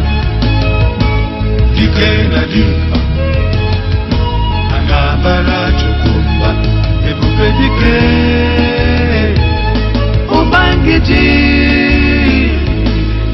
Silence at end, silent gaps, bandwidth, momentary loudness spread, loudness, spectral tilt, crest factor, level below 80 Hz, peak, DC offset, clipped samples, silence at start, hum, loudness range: 0 s; none; 6 kHz; 5 LU; -11 LUFS; -8 dB/octave; 10 dB; -14 dBFS; 0 dBFS; under 0.1%; under 0.1%; 0 s; none; 3 LU